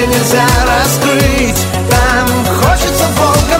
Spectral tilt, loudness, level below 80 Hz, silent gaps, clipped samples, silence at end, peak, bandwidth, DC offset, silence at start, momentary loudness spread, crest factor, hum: -4 dB/octave; -10 LUFS; -20 dBFS; none; under 0.1%; 0 s; 0 dBFS; 16.5 kHz; under 0.1%; 0 s; 3 LU; 10 dB; none